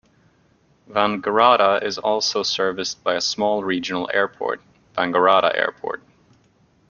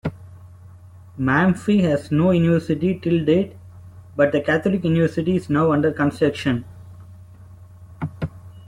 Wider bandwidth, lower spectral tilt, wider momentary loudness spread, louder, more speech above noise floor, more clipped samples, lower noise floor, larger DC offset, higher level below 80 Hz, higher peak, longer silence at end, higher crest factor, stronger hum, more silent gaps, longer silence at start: second, 7.4 kHz vs 11.5 kHz; second, -3 dB/octave vs -8 dB/octave; about the same, 12 LU vs 14 LU; about the same, -20 LUFS vs -20 LUFS; first, 39 dB vs 25 dB; neither; first, -59 dBFS vs -43 dBFS; neither; second, -64 dBFS vs -50 dBFS; about the same, -2 dBFS vs -4 dBFS; first, 0.95 s vs 0.05 s; about the same, 20 dB vs 16 dB; neither; neither; first, 0.9 s vs 0.05 s